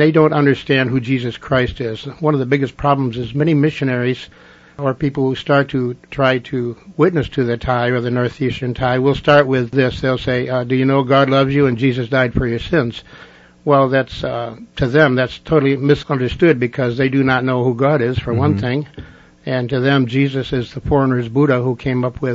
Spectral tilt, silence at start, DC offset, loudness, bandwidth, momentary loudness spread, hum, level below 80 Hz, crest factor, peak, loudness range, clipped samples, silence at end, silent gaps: -8 dB/octave; 0 s; under 0.1%; -17 LUFS; 7.6 kHz; 9 LU; none; -40 dBFS; 16 dB; 0 dBFS; 3 LU; under 0.1%; 0 s; none